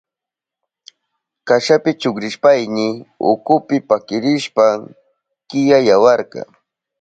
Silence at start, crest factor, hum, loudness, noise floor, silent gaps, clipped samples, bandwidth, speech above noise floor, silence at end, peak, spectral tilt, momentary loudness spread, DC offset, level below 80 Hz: 1.45 s; 16 dB; none; -15 LUFS; -86 dBFS; none; under 0.1%; 9 kHz; 72 dB; 0.6 s; 0 dBFS; -5.5 dB/octave; 13 LU; under 0.1%; -64 dBFS